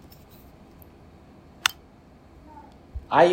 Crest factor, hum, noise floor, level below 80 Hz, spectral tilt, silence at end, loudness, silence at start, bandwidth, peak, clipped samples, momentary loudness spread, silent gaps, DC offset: 28 dB; none; -52 dBFS; -50 dBFS; -3.5 dB/octave; 0 s; -24 LUFS; 1.65 s; 16 kHz; 0 dBFS; under 0.1%; 26 LU; none; under 0.1%